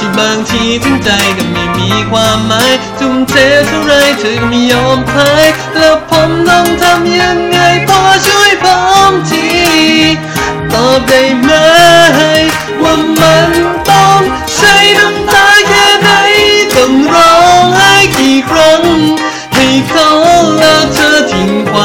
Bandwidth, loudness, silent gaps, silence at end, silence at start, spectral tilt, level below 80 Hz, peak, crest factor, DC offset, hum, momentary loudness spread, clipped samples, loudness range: 17.5 kHz; -6 LUFS; none; 0 s; 0 s; -3.5 dB/octave; -32 dBFS; 0 dBFS; 6 dB; under 0.1%; none; 7 LU; 0.5%; 3 LU